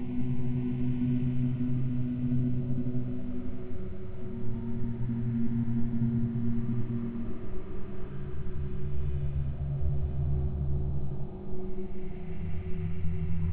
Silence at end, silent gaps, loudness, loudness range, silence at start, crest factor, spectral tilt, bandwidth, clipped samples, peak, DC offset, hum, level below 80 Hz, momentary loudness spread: 0 s; none; -34 LUFS; 4 LU; 0 s; 12 dB; -12.5 dB/octave; 4 kHz; under 0.1%; -16 dBFS; under 0.1%; none; -40 dBFS; 11 LU